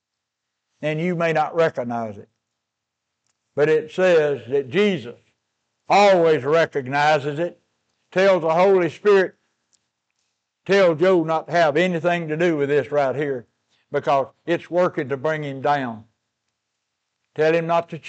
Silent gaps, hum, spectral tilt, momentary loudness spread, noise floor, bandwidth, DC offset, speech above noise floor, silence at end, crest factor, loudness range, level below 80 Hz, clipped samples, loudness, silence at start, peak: none; none; -6 dB/octave; 11 LU; -81 dBFS; 8.4 kHz; under 0.1%; 62 dB; 0 s; 12 dB; 5 LU; -74 dBFS; under 0.1%; -20 LUFS; 0.8 s; -8 dBFS